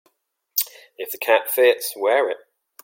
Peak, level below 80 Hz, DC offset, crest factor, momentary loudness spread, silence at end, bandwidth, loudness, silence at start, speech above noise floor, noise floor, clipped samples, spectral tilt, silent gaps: -4 dBFS; -84 dBFS; under 0.1%; 18 dB; 14 LU; 0.5 s; 17 kHz; -20 LUFS; 0.55 s; 48 dB; -67 dBFS; under 0.1%; 0.5 dB/octave; none